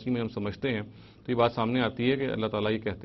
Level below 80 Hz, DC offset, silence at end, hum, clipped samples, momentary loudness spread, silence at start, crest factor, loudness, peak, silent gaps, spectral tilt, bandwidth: -56 dBFS; under 0.1%; 0 s; none; under 0.1%; 8 LU; 0 s; 20 dB; -29 LUFS; -10 dBFS; none; -8.5 dB/octave; 6 kHz